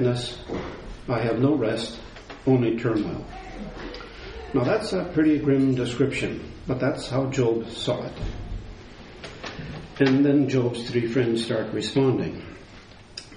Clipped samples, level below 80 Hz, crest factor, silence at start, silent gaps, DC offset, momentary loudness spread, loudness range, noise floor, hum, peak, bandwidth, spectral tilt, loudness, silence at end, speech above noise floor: under 0.1%; -44 dBFS; 18 dB; 0 s; none; under 0.1%; 18 LU; 4 LU; -46 dBFS; none; -6 dBFS; 10.5 kHz; -6.5 dB/octave; -24 LUFS; 0 s; 23 dB